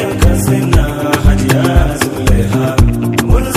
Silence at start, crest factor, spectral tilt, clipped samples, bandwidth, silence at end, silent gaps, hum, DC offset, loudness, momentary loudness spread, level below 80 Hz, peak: 0 s; 10 dB; -6 dB/octave; 0.8%; 16 kHz; 0 s; none; none; under 0.1%; -12 LUFS; 3 LU; -16 dBFS; 0 dBFS